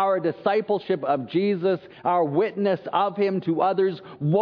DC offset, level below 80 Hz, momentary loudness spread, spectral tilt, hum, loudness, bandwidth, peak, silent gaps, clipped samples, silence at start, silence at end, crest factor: under 0.1%; -72 dBFS; 3 LU; -9.5 dB/octave; none; -24 LUFS; 5.2 kHz; -8 dBFS; none; under 0.1%; 0 s; 0 s; 16 dB